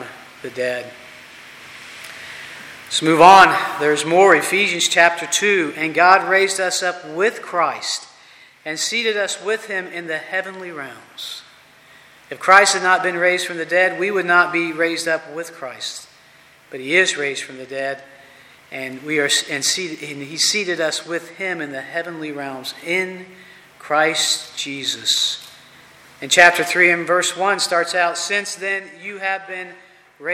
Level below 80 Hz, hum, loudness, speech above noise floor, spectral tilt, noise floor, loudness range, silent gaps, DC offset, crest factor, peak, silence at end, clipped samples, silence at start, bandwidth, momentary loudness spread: -64 dBFS; none; -17 LUFS; 31 dB; -2 dB/octave; -49 dBFS; 9 LU; none; under 0.1%; 20 dB; 0 dBFS; 0 s; under 0.1%; 0 s; 16.5 kHz; 20 LU